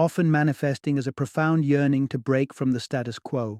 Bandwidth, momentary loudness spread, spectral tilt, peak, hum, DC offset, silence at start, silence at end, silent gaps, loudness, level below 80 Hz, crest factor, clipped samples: 13.5 kHz; 8 LU; -7.5 dB/octave; -10 dBFS; none; under 0.1%; 0 s; 0 s; none; -24 LUFS; -66 dBFS; 14 dB; under 0.1%